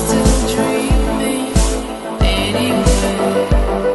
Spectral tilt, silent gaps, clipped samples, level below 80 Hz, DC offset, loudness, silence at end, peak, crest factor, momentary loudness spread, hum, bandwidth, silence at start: -5 dB/octave; none; under 0.1%; -18 dBFS; under 0.1%; -16 LUFS; 0 s; 0 dBFS; 14 dB; 4 LU; none; 12 kHz; 0 s